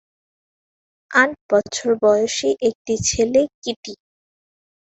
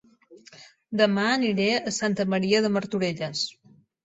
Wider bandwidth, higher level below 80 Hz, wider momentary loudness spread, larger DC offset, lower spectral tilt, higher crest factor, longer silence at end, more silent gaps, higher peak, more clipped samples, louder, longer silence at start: about the same, 8.2 kHz vs 8.2 kHz; first, -50 dBFS vs -66 dBFS; first, 12 LU vs 7 LU; neither; second, -3 dB/octave vs -4.5 dB/octave; about the same, 20 dB vs 20 dB; first, 0.9 s vs 0.55 s; first, 1.41-1.49 s, 2.75-2.85 s, 3.54-3.62 s, 3.76-3.83 s vs none; first, -2 dBFS vs -6 dBFS; neither; first, -19 LUFS vs -25 LUFS; first, 1.1 s vs 0.3 s